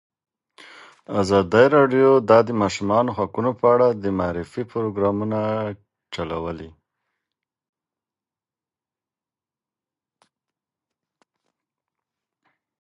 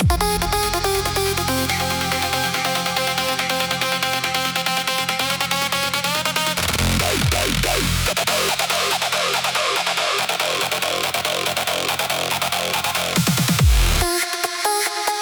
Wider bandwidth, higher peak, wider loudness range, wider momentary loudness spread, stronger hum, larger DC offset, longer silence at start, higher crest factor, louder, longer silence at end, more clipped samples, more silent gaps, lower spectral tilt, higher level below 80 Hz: second, 11.5 kHz vs over 20 kHz; about the same, -2 dBFS vs -4 dBFS; first, 18 LU vs 1 LU; first, 14 LU vs 2 LU; neither; neither; first, 1.1 s vs 0 s; first, 22 dB vs 16 dB; about the same, -20 LUFS vs -19 LUFS; first, 6.1 s vs 0 s; neither; neither; first, -6.5 dB/octave vs -3 dB/octave; second, -52 dBFS vs -30 dBFS